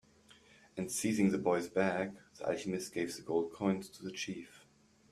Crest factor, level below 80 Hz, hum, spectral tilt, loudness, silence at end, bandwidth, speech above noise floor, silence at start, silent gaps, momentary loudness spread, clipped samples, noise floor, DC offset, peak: 20 dB; -72 dBFS; none; -5 dB/octave; -36 LUFS; 0.55 s; 15 kHz; 31 dB; 0.75 s; none; 12 LU; under 0.1%; -66 dBFS; under 0.1%; -16 dBFS